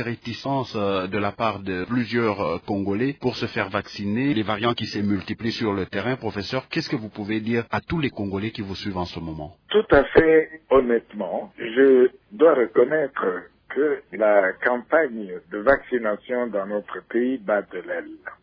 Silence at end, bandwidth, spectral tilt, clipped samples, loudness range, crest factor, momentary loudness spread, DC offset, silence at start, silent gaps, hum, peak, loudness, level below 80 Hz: 0.1 s; 5.4 kHz; -7 dB/octave; under 0.1%; 7 LU; 18 dB; 12 LU; under 0.1%; 0 s; none; none; -4 dBFS; -23 LUFS; -50 dBFS